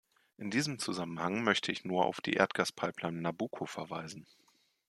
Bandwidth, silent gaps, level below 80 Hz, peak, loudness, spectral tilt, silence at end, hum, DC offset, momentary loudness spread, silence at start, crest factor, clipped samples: 13.5 kHz; none; -76 dBFS; -8 dBFS; -34 LUFS; -4 dB/octave; 0.65 s; none; under 0.1%; 11 LU; 0.4 s; 26 dB; under 0.1%